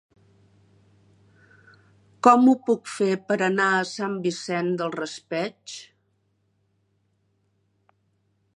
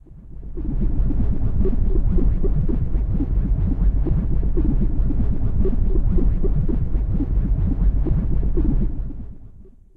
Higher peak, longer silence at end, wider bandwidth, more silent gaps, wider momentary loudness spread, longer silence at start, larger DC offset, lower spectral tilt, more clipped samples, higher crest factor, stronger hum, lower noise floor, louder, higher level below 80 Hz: first, -2 dBFS vs -6 dBFS; first, 2.75 s vs 0.35 s; first, 11 kHz vs 2.2 kHz; neither; first, 15 LU vs 6 LU; first, 2.25 s vs 0.1 s; neither; second, -5 dB/octave vs -12.5 dB/octave; neither; first, 24 dB vs 12 dB; neither; first, -70 dBFS vs -43 dBFS; about the same, -23 LUFS vs -23 LUFS; second, -76 dBFS vs -20 dBFS